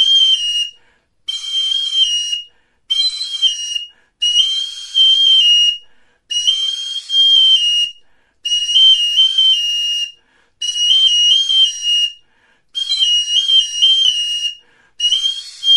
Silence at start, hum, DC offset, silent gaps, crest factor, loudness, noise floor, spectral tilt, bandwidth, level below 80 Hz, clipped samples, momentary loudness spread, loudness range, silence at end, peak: 0 s; none; under 0.1%; none; 14 dB; -12 LUFS; -55 dBFS; 5.5 dB/octave; 11.5 kHz; -60 dBFS; under 0.1%; 13 LU; 5 LU; 0 s; 0 dBFS